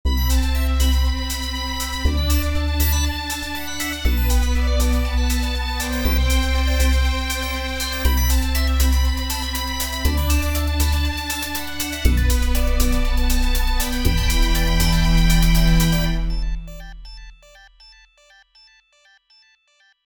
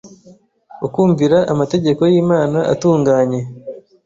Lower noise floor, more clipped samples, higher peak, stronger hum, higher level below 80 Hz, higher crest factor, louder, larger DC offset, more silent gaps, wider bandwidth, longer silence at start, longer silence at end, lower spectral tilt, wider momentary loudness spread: first, -60 dBFS vs -47 dBFS; neither; about the same, -2 dBFS vs -2 dBFS; neither; first, -20 dBFS vs -52 dBFS; about the same, 16 dB vs 14 dB; second, -21 LUFS vs -15 LUFS; neither; neither; first, 20 kHz vs 7.8 kHz; about the same, 0.05 s vs 0.05 s; first, 2.1 s vs 0.25 s; second, -4 dB/octave vs -7.5 dB/octave; second, 7 LU vs 13 LU